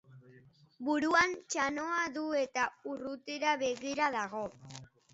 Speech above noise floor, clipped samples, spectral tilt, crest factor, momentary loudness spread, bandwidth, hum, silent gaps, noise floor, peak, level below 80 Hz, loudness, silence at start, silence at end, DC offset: 28 dB; under 0.1%; -1.5 dB/octave; 20 dB; 13 LU; 8 kHz; none; none; -61 dBFS; -14 dBFS; -70 dBFS; -33 LUFS; 0.1 s; 0.25 s; under 0.1%